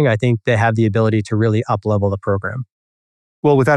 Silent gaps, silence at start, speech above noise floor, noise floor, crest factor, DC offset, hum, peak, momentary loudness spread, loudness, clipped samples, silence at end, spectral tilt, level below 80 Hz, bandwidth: 2.71-3.43 s; 0 s; over 74 dB; under -90 dBFS; 14 dB; under 0.1%; none; -2 dBFS; 7 LU; -17 LUFS; under 0.1%; 0 s; -8 dB/octave; -56 dBFS; 10 kHz